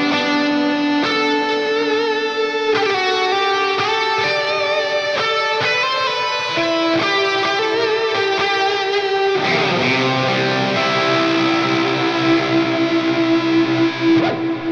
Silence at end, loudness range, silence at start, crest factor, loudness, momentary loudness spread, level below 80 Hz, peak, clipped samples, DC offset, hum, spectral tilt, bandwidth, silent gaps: 0 s; 1 LU; 0 s; 12 dB; -17 LUFS; 2 LU; -64 dBFS; -4 dBFS; under 0.1%; under 0.1%; none; -4.5 dB/octave; 8.2 kHz; none